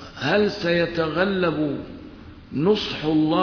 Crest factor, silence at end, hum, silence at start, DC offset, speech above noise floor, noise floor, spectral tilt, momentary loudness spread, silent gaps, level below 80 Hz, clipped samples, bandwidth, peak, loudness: 16 dB; 0 s; none; 0 s; under 0.1%; 20 dB; -42 dBFS; -6.5 dB/octave; 13 LU; none; -48 dBFS; under 0.1%; 5.4 kHz; -6 dBFS; -22 LUFS